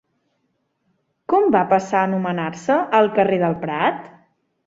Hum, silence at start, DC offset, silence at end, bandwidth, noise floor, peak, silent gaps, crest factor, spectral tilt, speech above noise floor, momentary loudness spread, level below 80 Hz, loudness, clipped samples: none; 1.3 s; under 0.1%; 0.6 s; 7.8 kHz; -70 dBFS; -2 dBFS; none; 18 dB; -6.5 dB/octave; 52 dB; 8 LU; -62 dBFS; -19 LUFS; under 0.1%